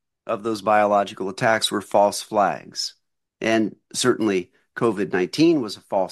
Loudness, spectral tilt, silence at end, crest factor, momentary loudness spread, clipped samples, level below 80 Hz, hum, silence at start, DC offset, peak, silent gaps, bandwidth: -22 LUFS; -4 dB/octave; 0 s; 18 dB; 9 LU; under 0.1%; -66 dBFS; none; 0.25 s; under 0.1%; -4 dBFS; none; 12.5 kHz